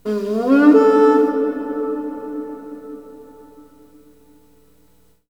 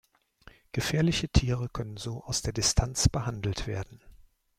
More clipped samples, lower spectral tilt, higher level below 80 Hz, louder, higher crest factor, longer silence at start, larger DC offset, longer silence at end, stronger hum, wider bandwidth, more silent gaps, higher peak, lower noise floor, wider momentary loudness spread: neither; first, -7 dB/octave vs -4 dB/octave; second, -60 dBFS vs -38 dBFS; first, -16 LUFS vs -29 LUFS; about the same, 18 dB vs 22 dB; second, 0.05 s vs 0.75 s; first, 0.2% vs under 0.1%; first, 2.05 s vs 0.5 s; first, 60 Hz at -60 dBFS vs none; second, 7.8 kHz vs 16 kHz; neither; first, -2 dBFS vs -8 dBFS; about the same, -57 dBFS vs -57 dBFS; first, 23 LU vs 11 LU